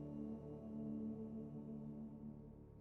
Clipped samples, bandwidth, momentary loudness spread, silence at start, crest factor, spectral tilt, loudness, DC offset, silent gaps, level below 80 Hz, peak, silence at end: under 0.1%; 3.1 kHz; 8 LU; 0 s; 12 dB; -12 dB/octave; -51 LUFS; under 0.1%; none; -68 dBFS; -38 dBFS; 0 s